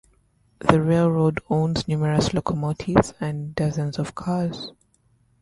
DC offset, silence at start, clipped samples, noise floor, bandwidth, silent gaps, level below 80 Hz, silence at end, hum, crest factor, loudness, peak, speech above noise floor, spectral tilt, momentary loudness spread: under 0.1%; 0.6 s; under 0.1%; -63 dBFS; 11.5 kHz; none; -46 dBFS; 0.7 s; none; 22 dB; -23 LUFS; 0 dBFS; 41 dB; -7 dB/octave; 10 LU